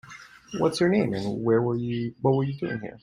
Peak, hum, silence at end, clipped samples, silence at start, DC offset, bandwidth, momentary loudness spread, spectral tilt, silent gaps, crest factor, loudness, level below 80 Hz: -8 dBFS; none; 0.05 s; under 0.1%; 0.05 s; under 0.1%; 11.5 kHz; 12 LU; -7 dB/octave; none; 18 dB; -25 LUFS; -58 dBFS